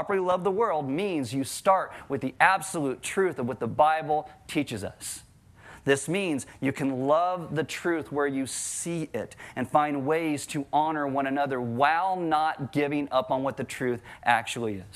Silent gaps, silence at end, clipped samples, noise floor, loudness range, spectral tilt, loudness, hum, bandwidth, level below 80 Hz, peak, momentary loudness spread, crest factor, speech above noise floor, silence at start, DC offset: none; 0.05 s; under 0.1%; -51 dBFS; 3 LU; -4.5 dB/octave; -27 LUFS; none; 15 kHz; -64 dBFS; -6 dBFS; 9 LU; 22 dB; 24 dB; 0 s; under 0.1%